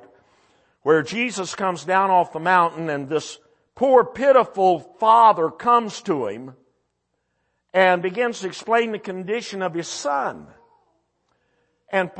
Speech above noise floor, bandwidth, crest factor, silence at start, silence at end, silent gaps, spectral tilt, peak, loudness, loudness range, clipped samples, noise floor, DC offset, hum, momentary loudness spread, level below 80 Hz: 54 dB; 8.8 kHz; 18 dB; 0.85 s; 0 s; none; -4.5 dB/octave; -2 dBFS; -20 LUFS; 7 LU; under 0.1%; -74 dBFS; under 0.1%; 60 Hz at -60 dBFS; 11 LU; -68 dBFS